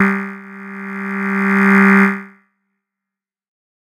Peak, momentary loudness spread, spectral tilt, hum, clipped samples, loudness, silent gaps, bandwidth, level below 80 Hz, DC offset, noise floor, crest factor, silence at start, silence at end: 0 dBFS; 20 LU; -8 dB/octave; none; under 0.1%; -14 LUFS; none; 11.5 kHz; -70 dBFS; under 0.1%; -86 dBFS; 16 dB; 0 s; 1.55 s